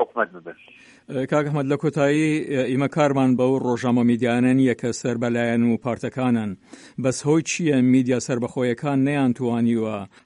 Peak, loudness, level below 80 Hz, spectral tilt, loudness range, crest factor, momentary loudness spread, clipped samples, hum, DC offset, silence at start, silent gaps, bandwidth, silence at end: -6 dBFS; -21 LUFS; -62 dBFS; -6.5 dB/octave; 2 LU; 16 dB; 8 LU; under 0.1%; none; under 0.1%; 0 s; none; 11 kHz; 0.2 s